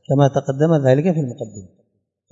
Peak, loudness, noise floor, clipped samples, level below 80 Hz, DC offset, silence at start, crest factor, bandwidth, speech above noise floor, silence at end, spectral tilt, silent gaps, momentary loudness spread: 0 dBFS; -17 LUFS; -67 dBFS; under 0.1%; -64 dBFS; under 0.1%; 0.1 s; 18 dB; 7.8 kHz; 50 dB; 0.65 s; -8 dB/octave; none; 15 LU